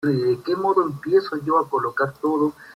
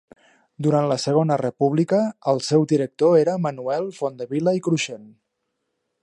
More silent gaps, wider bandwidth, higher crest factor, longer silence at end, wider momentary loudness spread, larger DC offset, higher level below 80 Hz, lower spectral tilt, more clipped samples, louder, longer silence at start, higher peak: neither; first, 14 kHz vs 11.5 kHz; about the same, 16 dB vs 16 dB; second, 0.05 s vs 0.95 s; second, 3 LU vs 8 LU; neither; first, -64 dBFS vs -70 dBFS; about the same, -7.5 dB/octave vs -6.5 dB/octave; neither; about the same, -22 LUFS vs -21 LUFS; second, 0 s vs 0.6 s; about the same, -6 dBFS vs -6 dBFS